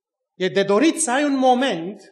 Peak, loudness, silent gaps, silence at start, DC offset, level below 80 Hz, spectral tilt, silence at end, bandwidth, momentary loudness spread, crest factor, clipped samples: -4 dBFS; -19 LUFS; none; 0.4 s; under 0.1%; -82 dBFS; -3.5 dB/octave; 0.15 s; 12 kHz; 7 LU; 14 dB; under 0.1%